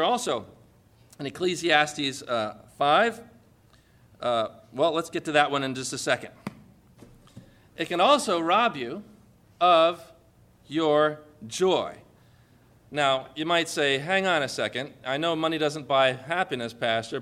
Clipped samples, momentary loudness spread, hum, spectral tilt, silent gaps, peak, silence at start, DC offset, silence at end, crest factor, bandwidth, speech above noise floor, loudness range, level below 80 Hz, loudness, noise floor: under 0.1%; 14 LU; none; -3.5 dB/octave; none; -6 dBFS; 0 s; under 0.1%; 0 s; 20 dB; 15 kHz; 33 dB; 3 LU; -66 dBFS; -25 LUFS; -58 dBFS